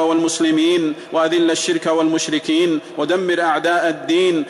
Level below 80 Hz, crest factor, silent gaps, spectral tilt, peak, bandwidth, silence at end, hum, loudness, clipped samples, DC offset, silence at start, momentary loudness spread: -66 dBFS; 10 dB; none; -3.5 dB/octave; -6 dBFS; 12 kHz; 0 s; none; -17 LUFS; under 0.1%; under 0.1%; 0 s; 4 LU